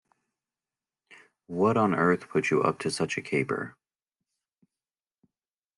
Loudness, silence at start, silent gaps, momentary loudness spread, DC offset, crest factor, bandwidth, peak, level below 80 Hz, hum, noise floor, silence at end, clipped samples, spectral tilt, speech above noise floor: -27 LUFS; 1.5 s; none; 9 LU; under 0.1%; 20 dB; 11.5 kHz; -10 dBFS; -72 dBFS; none; under -90 dBFS; 2.05 s; under 0.1%; -6 dB/octave; over 64 dB